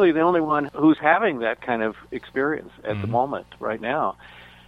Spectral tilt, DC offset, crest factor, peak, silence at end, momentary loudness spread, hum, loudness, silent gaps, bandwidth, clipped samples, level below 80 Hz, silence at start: -8 dB/octave; under 0.1%; 18 dB; -4 dBFS; 0.25 s; 12 LU; none; -23 LUFS; none; 5 kHz; under 0.1%; -56 dBFS; 0 s